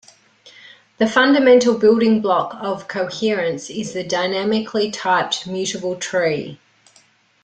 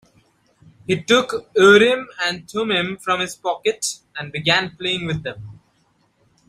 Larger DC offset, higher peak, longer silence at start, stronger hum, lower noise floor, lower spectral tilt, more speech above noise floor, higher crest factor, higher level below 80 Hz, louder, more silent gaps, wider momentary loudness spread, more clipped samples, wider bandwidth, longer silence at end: neither; about the same, -2 dBFS vs -2 dBFS; second, 0.45 s vs 0.9 s; neither; second, -55 dBFS vs -62 dBFS; about the same, -4 dB/octave vs -3.5 dB/octave; second, 38 dB vs 43 dB; about the same, 16 dB vs 20 dB; second, -62 dBFS vs -56 dBFS; about the same, -18 LUFS vs -19 LUFS; neither; second, 12 LU vs 15 LU; neither; second, 9.4 kHz vs 14.5 kHz; about the same, 0.9 s vs 0.95 s